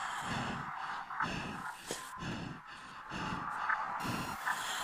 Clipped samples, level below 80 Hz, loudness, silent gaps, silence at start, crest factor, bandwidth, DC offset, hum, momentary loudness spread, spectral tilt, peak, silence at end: under 0.1%; -60 dBFS; -39 LUFS; none; 0 s; 20 dB; 15.5 kHz; under 0.1%; none; 9 LU; -3.5 dB/octave; -20 dBFS; 0 s